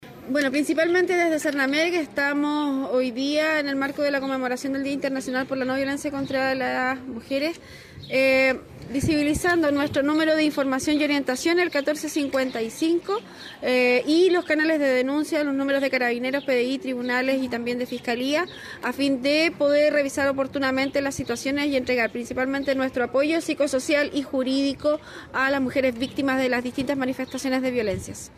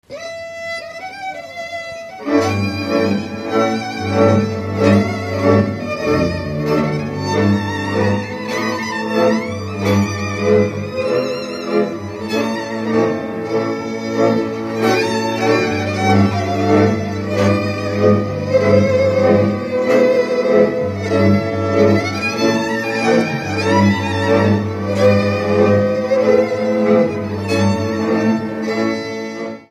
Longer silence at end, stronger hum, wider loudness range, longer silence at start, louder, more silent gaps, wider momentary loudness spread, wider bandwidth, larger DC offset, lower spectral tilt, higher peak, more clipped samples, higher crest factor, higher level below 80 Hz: about the same, 0.1 s vs 0.05 s; neither; about the same, 3 LU vs 4 LU; about the same, 0 s vs 0.1 s; second, -23 LUFS vs -16 LUFS; neither; about the same, 7 LU vs 9 LU; about the same, 14.5 kHz vs 14.5 kHz; neither; second, -4 dB/octave vs -6.5 dB/octave; second, -10 dBFS vs 0 dBFS; neither; about the same, 14 dB vs 16 dB; about the same, -54 dBFS vs -50 dBFS